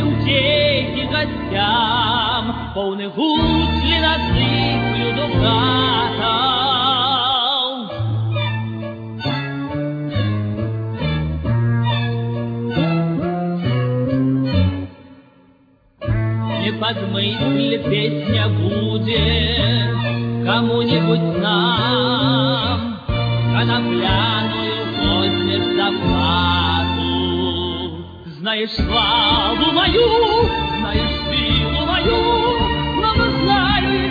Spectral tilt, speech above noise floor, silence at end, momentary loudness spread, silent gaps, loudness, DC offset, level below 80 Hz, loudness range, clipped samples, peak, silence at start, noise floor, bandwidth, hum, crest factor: -8 dB/octave; 37 dB; 0 s; 8 LU; none; -18 LUFS; under 0.1%; -32 dBFS; 5 LU; under 0.1%; -2 dBFS; 0 s; -53 dBFS; 5 kHz; none; 16 dB